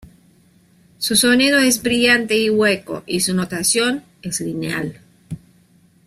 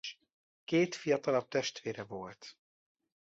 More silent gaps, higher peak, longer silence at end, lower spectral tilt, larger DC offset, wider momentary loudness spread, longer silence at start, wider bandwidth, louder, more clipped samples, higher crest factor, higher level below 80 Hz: second, none vs 0.33-0.67 s; first, -2 dBFS vs -18 dBFS; about the same, 0.7 s vs 0.8 s; second, -3 dB/octave vs -4.5 dB/octave; neither; second, 16 LU vs 20 LU; first, 1 s vs 0.05 s; first, 15.5 kHz vs 8 kHz; first, -17 LUFS vs -34 LUFS; neither; about the same, 18 dB vs 18 dB; first, -54 dBFS vs -76 dBFS